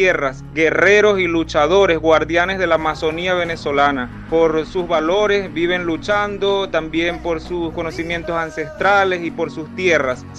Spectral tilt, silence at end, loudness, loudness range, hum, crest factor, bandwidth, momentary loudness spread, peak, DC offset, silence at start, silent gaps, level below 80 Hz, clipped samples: -5 dB/octave; 0 s; -17 LUFS; 5 LU; none; 16 dB; 9 kHz; 9 LU; 0 dBFS; under 0.1%; 0 s; none; -40 dBFS; under 0.1%